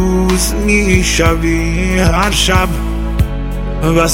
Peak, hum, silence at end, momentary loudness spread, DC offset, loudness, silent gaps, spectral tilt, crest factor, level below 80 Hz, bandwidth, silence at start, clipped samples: 0 dBFS; none; 0 s; 7 LU; under 0.1%; -13 LUFS; none; -4.5 dB/octave; 12 dB; -18 dBFS; 16.5 kHz; 0 s; under 0.1%